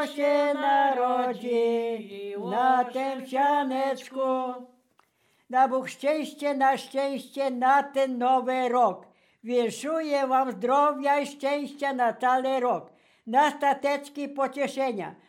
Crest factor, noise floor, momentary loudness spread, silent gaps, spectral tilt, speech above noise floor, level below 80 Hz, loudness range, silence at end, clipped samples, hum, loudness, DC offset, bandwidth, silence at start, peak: 16 dB; -68 dBFS; 8 LU; none; -4 dB/octave; 42 dB; under -90 dBFS; 2 LU; 0.15 s; under 0.1%; none; -26 LUFS; under 0.1%; 16 kHz; 0 s; -10 dBFS